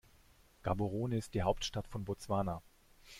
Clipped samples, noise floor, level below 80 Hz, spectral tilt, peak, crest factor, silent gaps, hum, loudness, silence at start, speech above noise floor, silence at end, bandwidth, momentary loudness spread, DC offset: under 0.1%; -65 dBFS; -54 dBFS; -6 dB/octave; -18 dBFS; 20 dB; none; none; -38 LUFS; 0.65 s; 28 dB; 0 s; 16 kHz; 7 LU; under 0.1%